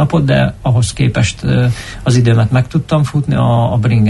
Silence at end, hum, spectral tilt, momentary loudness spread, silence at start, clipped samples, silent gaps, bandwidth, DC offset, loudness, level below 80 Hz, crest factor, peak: 0 s; none; -6.5 dB/octave; 4 LU; 0 s; under 0.1%; none; 11.5 kHz; under 0.1%; -13 LUFS; -32 dBFS; 10 dB; -2 dBFS